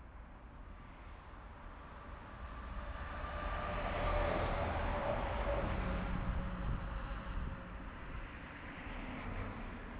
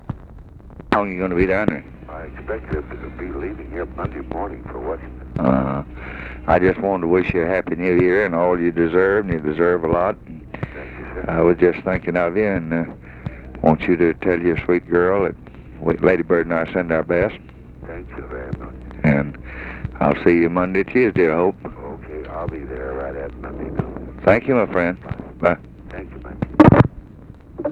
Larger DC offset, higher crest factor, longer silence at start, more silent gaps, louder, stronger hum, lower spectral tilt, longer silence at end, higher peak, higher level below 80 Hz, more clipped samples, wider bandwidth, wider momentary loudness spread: neither; about the same, 16 dB vs 20 dB; about the same, 0 s vs 0.05 s; neither; second, -41 LUFS vs -19 LUFS; neither; second, -5 dB/octave vs -9.5 dB/octave; about the same, 0 s vs 0 s; second, -24 dBFS vs 0 dBFS; second, -44 dBFS vs -38 dBFS; neither; second, 4 kHz vs 5.8 kHz; about the same, 17 LU vs 17 LU